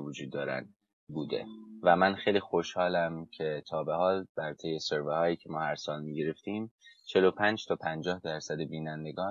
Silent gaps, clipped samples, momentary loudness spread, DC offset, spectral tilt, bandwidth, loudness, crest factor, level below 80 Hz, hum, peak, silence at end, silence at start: 0.93-1.07 s, 4.29-4.35 s, 6.71-6.79 s; under 0.1%; 12 LU; under 0.1%; -5.5 dB/octave; 7.6 kHz; -32 LUFS; 22 dB; -66 dBFS; none; -10 dBFS; 0 s; 0 s